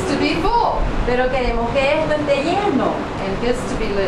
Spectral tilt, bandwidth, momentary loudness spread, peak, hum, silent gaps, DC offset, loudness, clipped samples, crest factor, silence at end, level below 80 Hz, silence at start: -5.5 dB/octave; 12 kHz; 5 LU; -4 dBFS; none; none; under 0.1%; -19 LUFS; under 0.1%; 14 dB; 0 s; -28 dBFS; 0 s